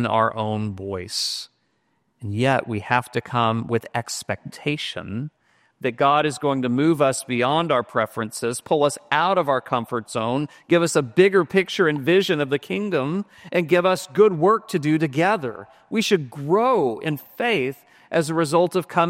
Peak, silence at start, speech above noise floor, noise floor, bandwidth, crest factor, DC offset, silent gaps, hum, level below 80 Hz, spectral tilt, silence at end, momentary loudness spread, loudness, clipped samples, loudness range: -2 dBFS; 0 s; 47 dB; -69 dBFS; 16 kHz; 20 dB; under 0.1%; none; none; -64 dBFS; -5 dB/octave; 0 s; 10 LU; -22 LUFS; under 0.1%; 4 LU